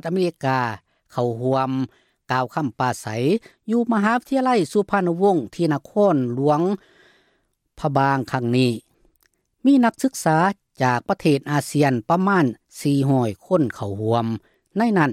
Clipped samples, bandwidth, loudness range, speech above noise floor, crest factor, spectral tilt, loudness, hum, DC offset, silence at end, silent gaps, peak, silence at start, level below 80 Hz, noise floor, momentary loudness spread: under 0.1%; 15 kHz; 4 LU; 47 dB; 16 dB; -6.5 dB/octave; -21 LUFS; none; under 0.1%; 0 s; none; -4 dBFS; 0.05 s; -60 dBFS; -68 dBFS; 7 LU